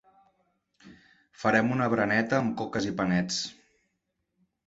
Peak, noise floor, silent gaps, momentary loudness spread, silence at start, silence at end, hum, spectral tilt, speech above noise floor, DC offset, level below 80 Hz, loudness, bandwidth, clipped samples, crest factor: -8 dBFS; -80 dBFS; none; 6 LU; 0.85 s; 1.15 s; none; -5 dB/octave; 53 dB; under 0.1%; -62 dBFS; -27 LUFS; 8 kHz; under 0.1%; 22 dB